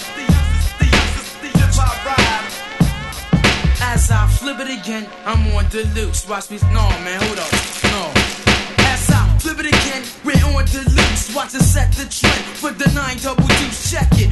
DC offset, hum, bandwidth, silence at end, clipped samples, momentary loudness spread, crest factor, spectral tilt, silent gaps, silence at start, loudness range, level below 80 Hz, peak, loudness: under 0.1%; none; 12.5 kHz; 0 s; under 0.1%; 7 LU; 16 dB; -4.5 dB/octave; none; 0 s; 3 LU; -20 dBFS; 0 dBFS; -16 LUFS